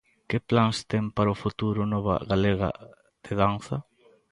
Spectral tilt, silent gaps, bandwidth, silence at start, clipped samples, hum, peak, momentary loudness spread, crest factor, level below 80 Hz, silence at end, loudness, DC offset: -7 dB/octave; none; 11.5 kHz; 0.3 s; under 0.1%; none; -8 dBFS; 10 LU; 20 dB; -48 dBFS; 0.5 s; -27 LUFS; under 0.1%